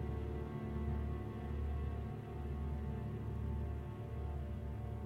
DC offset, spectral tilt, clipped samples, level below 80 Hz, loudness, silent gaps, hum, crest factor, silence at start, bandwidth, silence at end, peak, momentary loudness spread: under 0.1%; -9.5 dB/octave; under 0.1%; -44 dBFS; -43 LUFS; none; none; 12 dB; 0 s; 4.5 kHz; 0 s; -30 dBFS; 4 LU